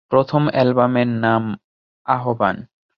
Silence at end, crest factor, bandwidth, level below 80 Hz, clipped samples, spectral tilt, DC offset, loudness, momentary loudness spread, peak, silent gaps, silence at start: 0.35 s; 18 dB; 6 kHz; -56 dBFS; under 0.1%; -9.5 dB/octave; under 0.1%; -18 LUFS; 14 LU; -2 dBFS; 1.64-2.05 s; 0.1 s